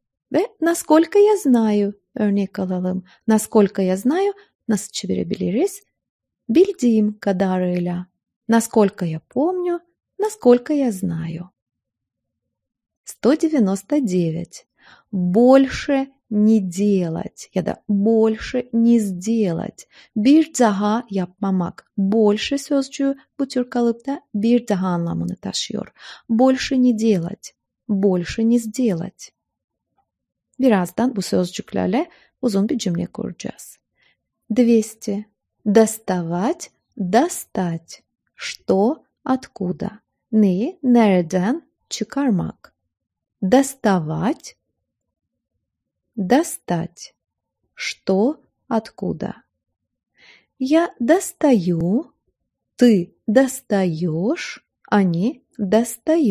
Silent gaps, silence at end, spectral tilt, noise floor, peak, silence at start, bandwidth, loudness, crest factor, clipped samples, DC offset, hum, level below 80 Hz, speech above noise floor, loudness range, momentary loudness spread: 4.55-4.59 s, 6.09-6.19 s, 8.36-8.41 s, 11.62-11.66 s, 12.97-13.04 s, 29.64-29.68 s; 0 s; -6 dB/octave; -81 dBFS; 0 dBFS; 0.3 s; 15.5 kHz; -20 LUFS; 18 dB; under 0.1%; under 0.1%; none; -54 dBFS; 63 dB; 5 LU; 13 LU